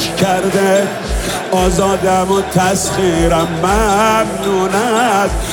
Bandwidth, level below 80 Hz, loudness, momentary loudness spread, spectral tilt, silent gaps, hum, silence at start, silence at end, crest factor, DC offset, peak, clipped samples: 19 kHz; -26 dBFS; -13 LUFS; 4 LU; -4.5 dB/octave; none; none; 0 s; 0 s; 12 dB; under 0.1%; 0 dBFS; under 0.1%